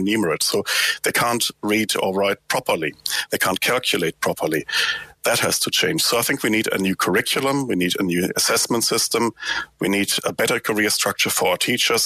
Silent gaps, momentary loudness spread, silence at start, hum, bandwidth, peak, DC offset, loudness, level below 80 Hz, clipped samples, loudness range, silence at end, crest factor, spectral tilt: none; 5 LU; 0 s; none; 15.5 kHz; -2 dBFS; under 0.1%; -20 LUFS; -58 dBFS; under 0.1%; 2 LU; 0 s; 18 dB; -2.5 dB/octave